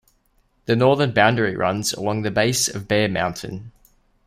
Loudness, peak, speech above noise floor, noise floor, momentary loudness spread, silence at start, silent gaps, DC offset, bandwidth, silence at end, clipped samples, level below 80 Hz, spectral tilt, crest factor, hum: -20 LUFS; -2 dBFS; 43 dB; -63 dBFS; 14 LU; 0.7 s; none; under 0.1%; 16 kHz; 0.55 s; under 0.1%; -52 dBFS; -4 dB/octave; 20 dB; none